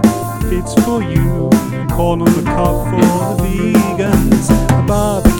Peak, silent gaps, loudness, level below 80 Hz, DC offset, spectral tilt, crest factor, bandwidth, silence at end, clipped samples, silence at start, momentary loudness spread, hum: 0 dBFS; none; -14 LUFS; -22 dBFS; under 0.1%; -6.5 dB/octave; 12 dB; 19 kHz; 0 s; 0.5%; 0 s; 4 LU; none